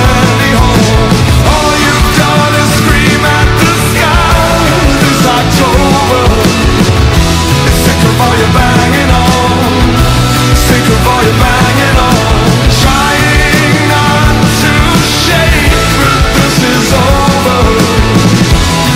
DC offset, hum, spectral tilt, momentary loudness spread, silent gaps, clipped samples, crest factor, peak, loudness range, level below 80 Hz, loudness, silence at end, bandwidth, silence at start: under 0.1%; none; -4.5 dB/octave; 1 LU; none; 0.6%; 6 dB; 0 dBFS; 0 LU; -14 dBFS; -7 LUFS; 0 s; 16.5 kHz; 0 s